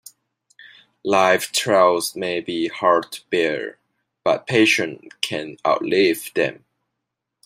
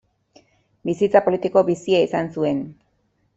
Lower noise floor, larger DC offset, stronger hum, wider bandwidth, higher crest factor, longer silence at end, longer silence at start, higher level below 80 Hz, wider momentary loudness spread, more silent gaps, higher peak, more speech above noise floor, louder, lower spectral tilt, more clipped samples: first, -80 dBFS vs -66 dBFS; neither; neither; first, 16 kHz vs 8 kHz; about the same, 20 dB vs 20 dB; first, 0.95 s vs 0.65 s; first, 1.05 s vs 0.85 s; second, -68 dBFS vs -62 dBFS; about the same, 10 LU vs 11 LU; neither; about the same, 0 dBFS vs -2 dBFS; first, 61 dB vs 47 dB; about the same, -20 LUFS vs -20 LUFS; second, -3.5 dB/octave vs -6.5 dB/octave; neither